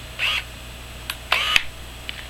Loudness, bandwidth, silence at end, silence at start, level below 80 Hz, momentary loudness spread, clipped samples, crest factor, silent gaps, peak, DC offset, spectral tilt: -21 LUFS; 16 kHz; 0 s; 0 s; -40 dBFS; 18 LU; under 0.1%; 26 dB; none; 0 dBFS; under 0.1%; -1 dB/octave